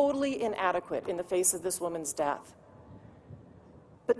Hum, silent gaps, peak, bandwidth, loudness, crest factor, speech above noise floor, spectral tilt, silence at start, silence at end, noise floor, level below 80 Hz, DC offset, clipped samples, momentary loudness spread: none; none; -12 dBFS; 11 kHz; -31 LUFS; 20 dB; 24 dB; -3 dB/octave; 0 s; 0 s; -55 dBFS; -66 dBFS; under 0.1%; under 0.1%; 25 LU